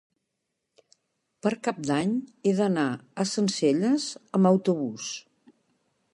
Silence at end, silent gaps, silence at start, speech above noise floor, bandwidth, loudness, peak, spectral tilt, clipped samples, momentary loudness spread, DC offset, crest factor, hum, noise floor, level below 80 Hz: 0.95 s; none; 1.45 s; 56 dB; 11 kHz; -26 LUFS; -10 dBFS; -5.5 dB/octave; under 0.1%; 9 LU; under 0.1%; 18 dB; none; -81 dBFS; -74 dBFS